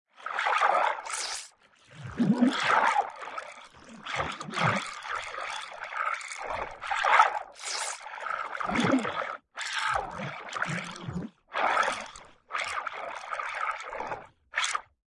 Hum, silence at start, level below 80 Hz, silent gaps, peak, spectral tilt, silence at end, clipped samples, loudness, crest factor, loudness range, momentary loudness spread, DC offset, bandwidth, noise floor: none; 0.2 s; -62 dBFS; none; -6 dBFS; -3.5 dB/octave; 0.25 s; under 0.1%; -30 LUFS; 24 dB; 5 LU; 14 LU; under 0.1%; 11.5 kHz; -57 dBFS